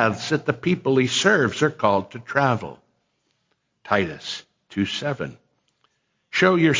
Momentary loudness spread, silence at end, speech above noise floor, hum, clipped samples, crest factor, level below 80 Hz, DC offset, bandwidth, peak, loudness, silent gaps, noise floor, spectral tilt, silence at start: 14 LU; 0 s; 50 dB; none; under 0.1%; 20 dB; -56 dBFS; under 0.1%; 7.6 kHz; -4 dBFS; -22 LUFS; none; -72 dBFS; -5 dB/octave; 0 s